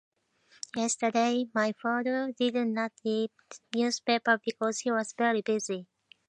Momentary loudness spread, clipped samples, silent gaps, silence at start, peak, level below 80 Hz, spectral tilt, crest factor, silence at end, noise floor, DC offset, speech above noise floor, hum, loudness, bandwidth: 8 LU; under 0.1%; none; 0.75 s; -10 dBFS; -82 dBFS; -3 dB/octave; 20 dB; 0.45 s; -64 dBFS; under 0.1%; 35 dB; none; -29 LUFS; 10 kHz